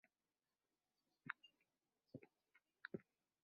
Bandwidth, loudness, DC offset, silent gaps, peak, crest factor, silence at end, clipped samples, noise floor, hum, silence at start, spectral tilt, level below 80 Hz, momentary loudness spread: 4.8 kHz; -58 LUFS; under 0.1%; none; -28 dBFS; 34 dB; 0.4 s; under 0.1%; under -90 dBFS; 50 Hz at -90 dBFS; 1.25 s; -4 dB/octave; under -90 dBFS; 9 LU